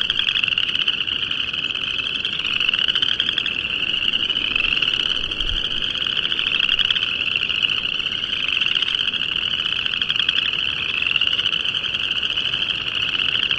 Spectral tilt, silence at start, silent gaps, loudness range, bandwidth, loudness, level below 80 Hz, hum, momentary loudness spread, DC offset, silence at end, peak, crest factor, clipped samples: -1.5 dB/octave; 0 s; none; 1 LU; 11 kHz; -19 LUFS; -42 dBFS; none; 4 LU; under 0.1%; 0 s; -2 dBFS; 20 dB; under 0.1%